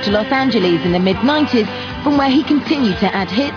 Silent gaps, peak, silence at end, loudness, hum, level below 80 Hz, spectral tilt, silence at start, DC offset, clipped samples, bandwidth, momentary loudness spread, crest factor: none; -2 dBFS; 0 s; -15 LUFS; none; -40 dBFS; -6.5 dB/octave; 0 s; under 0.1%; under 0.1%; 5.4 kHz; 4 LU; 14 dB